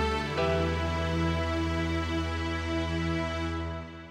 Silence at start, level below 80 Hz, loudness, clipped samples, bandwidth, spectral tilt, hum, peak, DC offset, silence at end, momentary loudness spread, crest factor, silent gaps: 0 s; -38 dBFS; -30 LUFS; under 0.1%; 10.5 kHz; -6 dB/octave; none; -16 dBFS; under 0.1%; 0 s; 5 LU; 14 dB; none